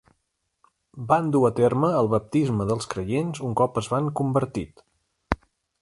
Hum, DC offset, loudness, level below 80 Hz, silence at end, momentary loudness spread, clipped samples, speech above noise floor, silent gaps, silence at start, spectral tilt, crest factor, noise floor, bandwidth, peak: none; under 0.1%; -24 LUFS; -48 dBFS; 0.45 s; 11 LU; under 0.1%; 53 dB; none; 0.95 s; -7 dB/octave; 24 dB; -76 dBFS; 11.5 kHz; 0 dBFS